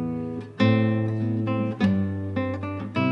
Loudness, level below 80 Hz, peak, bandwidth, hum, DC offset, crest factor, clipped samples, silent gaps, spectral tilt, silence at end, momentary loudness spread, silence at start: -25 LUFS; -62 dBFS; -8 dBFS; 6.2 kHz; none; under 0.1%; 16 dB; under 0.1%; none; -9 dB/octave; 0 s; 9 LU; 0 s